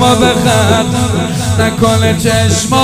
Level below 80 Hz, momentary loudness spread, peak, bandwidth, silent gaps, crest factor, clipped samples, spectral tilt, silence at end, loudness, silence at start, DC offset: -32 dBFS; 4 LU; 0 dBFS; 16 kHz; none; 10 dB; 0.3%; -4.5 dB/octave; 0 s; -11 LUFS; 0 s; under 0.1%